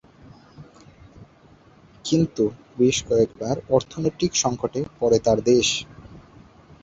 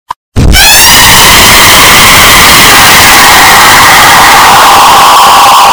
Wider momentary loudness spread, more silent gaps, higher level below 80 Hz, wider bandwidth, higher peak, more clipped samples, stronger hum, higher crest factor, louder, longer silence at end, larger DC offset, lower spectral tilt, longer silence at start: first, 9 LU vs 2 LU; neither; second, -50 dBFS vs -16 dBFS; second, 8.2 kHz vs over 20 kHz; second, -4 dBFS vs 0 dBFS; second, under 0.1% vs 90%; neither; first, 20 dB vs 0 dB; second, -22 LUFS vs 2 LUFS; first, 0.65 s vs 0 s; neither; first, -4.5 dB/octave vs -1 dB/octave; first, 0.6 s vs 0.35 s